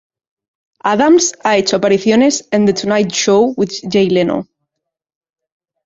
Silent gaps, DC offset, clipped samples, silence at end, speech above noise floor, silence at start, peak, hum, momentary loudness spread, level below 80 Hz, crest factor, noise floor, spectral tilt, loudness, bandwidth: none; under 0.1%; under 0.1%; 1.4 s; 66 dB; 0.85 s; -2 dBFS; none; 7 LU; -54 dBFS; 14 dB; -79 dBFS; -4 dB/octave; -13 LUFS; 8 kHz